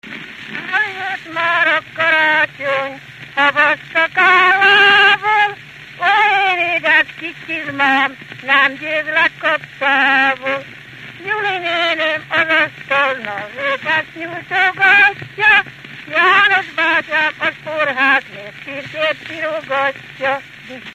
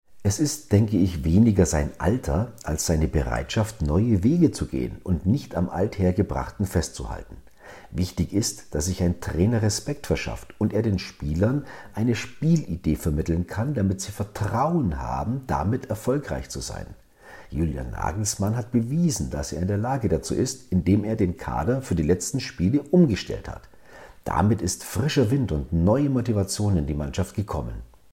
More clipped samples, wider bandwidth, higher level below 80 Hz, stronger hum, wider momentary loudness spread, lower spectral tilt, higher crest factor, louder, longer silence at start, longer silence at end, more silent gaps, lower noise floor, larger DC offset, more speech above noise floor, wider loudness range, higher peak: neither; second, 14 kHz vs 16 kHz; second, -58 dBFS vs -38 dBFS; neither; first, 17 LU vs 9 LU; second, -3.5 dB/octave vs -6 dB/octave; about the same, 16 dB vs 18 dB; first, -14 LUFS vs -25 LUFS; about the same, 0.05 s vs 0.1 s; second, 0 s vs 0.25 s; neither; second, -35 dBFS vs -47 dBFS; neither; second, 19 dB vs 24 dB; about the same, 6 LU vs 4 LU; first, 0 dBFS vs -6 dBFS